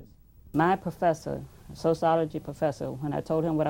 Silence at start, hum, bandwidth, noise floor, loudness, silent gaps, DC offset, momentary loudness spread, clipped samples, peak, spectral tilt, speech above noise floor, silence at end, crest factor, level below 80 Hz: 0 s; none; 16.5 kHz; -53 dBFS; -28 LUFS; none; under 0.1%; 9 LU; under 0.1%; -10 dBFS; -7.5 dB/octave; 26 dB; 0 s; 18 dB; -54 dBFS